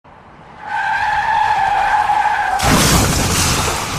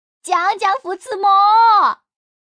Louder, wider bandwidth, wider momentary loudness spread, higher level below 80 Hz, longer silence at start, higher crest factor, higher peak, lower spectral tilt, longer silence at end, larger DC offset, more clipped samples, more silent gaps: about the same, -15 LUFS vs -14 LUFS; first, 15.5 kHz vs 10.5 kHz; second, 6 LU vs 13 LU; first, -30 dBFS vs -78 dBFS; about the same, 0.25 s vs 0.25 s; about the same, 16 dB vs 12 dB; first, 0 dBFS vs -4 dBFS; first, -3 dB/octave vs -0.5 dB/octave; second, 0 s vs 0.6 s; neither; neither; neither